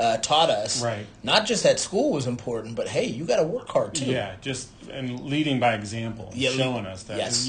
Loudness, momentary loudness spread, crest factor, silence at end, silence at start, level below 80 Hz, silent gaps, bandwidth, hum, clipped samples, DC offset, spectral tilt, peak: -25 LUFS; 12 LU; 20 dB; 0 s; 0 s; -56 dBFS; none; 10 kHz; none; under 0.1%; under 0.1%; -3.5 dB/octave; -4 dBFS